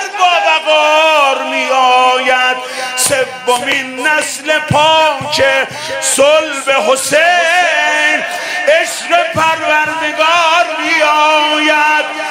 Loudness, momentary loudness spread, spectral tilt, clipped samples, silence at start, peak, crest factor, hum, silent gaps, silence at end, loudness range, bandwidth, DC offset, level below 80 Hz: -10 LUFS; 6 LU; -1.5 dB/octave; under 0.1%; 0 s; 0 dBFS; 12 dB; none; none; 0 s; 2 LU; 16.5 kHz; under 0.1%; -54 dBFS